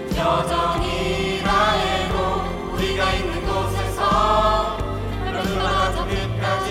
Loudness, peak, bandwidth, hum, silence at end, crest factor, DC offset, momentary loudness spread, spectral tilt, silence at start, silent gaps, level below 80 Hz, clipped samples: -21 LUFS; -6 dBFS; 16 kHz; none; 0 s; 16 dB; under 0.1%; 7 LU; -5 dB/octave; 0 s; none; -30 dBFS; under 0.1%